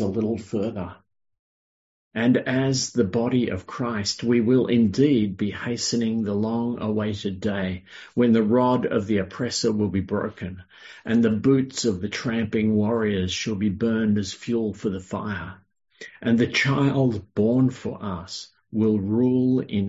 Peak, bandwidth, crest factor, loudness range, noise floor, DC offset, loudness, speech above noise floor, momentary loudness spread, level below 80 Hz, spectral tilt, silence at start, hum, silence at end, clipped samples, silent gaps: -8 dBFS; 8 kHz; 16 dB; 3 LU; under -90 dBFS; under 0.1%; -23 LUFS; over 67 dB; 12 LU; -50 dBFS; -6 dB/octave; 0 s; none; 0 s; under 0.1%; 1.39-2.11 s